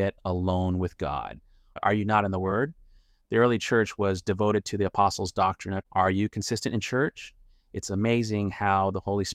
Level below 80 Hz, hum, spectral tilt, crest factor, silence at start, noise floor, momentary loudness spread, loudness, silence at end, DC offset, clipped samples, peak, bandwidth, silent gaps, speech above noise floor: -52 dBFS; none; -5.5 dB/octave; 18 dB; 0 s; -57 dBFS; 9 LU; -27 LUFS; 0 s; under 0.1%; under 0.1%; -8 dBFS; 14 kHz; none; 31 dB